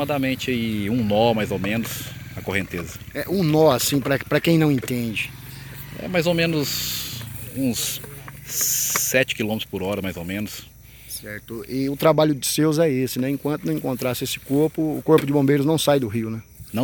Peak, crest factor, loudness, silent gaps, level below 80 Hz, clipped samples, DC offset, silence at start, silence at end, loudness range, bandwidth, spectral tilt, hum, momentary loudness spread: -4 dBFS; 20 dB; -22 LUFS; none; -50 dBFS; under 0.1%; under 0.1%; 0 s; 0 s; 3 LU; over 20 kHz; -4.5 dB/octave; none; 14 LU